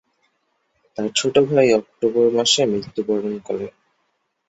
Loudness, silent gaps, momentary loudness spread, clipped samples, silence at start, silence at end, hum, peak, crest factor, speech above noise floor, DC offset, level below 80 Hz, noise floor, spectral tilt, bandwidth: -19 LUFS; none; 13 LU; under 0.1%; 1 s; 0.8 s; none; -2 dBFS; 18 dB; 52 dB; under 0.1%; -60 dBFS; -70 dBFS; -3.5 dB/octave; 8.2 kHz